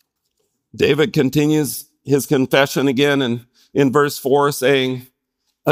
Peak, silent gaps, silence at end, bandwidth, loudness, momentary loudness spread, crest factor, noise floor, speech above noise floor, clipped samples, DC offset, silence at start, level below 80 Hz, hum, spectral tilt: 0 dBFS; none; 0 s; 16 kHz; -17 LUFS; 9 LU; 18 dB; -72 dBFS; 56 dB; under 0.1%; under 0.1%; 0.75 s; -58 dBFS; none; -5 dB/octave